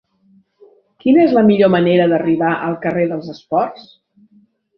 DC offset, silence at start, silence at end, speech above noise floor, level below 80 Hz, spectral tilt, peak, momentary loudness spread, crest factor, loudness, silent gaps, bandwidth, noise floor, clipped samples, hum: under 0.1%; 1.05 s; 1 s; 40 dB; -58 dBFS; -9 dB/octave; -2 dBFS; 9 LU; 14 dB; -15 LUFS; none; 6 kHz; -54 dBFS; under 0.1%; none